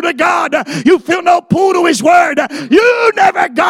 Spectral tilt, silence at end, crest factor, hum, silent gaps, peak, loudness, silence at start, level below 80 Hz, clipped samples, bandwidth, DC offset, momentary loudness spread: -4.5 dB/octave; 0 s; 10 dB; none; none; 0 dBFS; -10 LUFS; 0 s; -52 dBFS; 0.1%; 15.5 kHz; under 0.1%; 5 LU